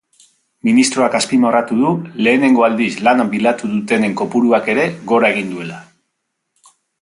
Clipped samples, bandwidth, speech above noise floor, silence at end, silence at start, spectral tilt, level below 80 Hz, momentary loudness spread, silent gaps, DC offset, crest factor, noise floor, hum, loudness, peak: under 0.1%; 11.5 kHz; 59 dB; 1.2 s; 0.65 s; -4.5 dB/octave; -62 dBFS; 8 LU; none; under 0.1%; 14 dB; -73 dBFS; none; -15 LUFS; 0 dBFS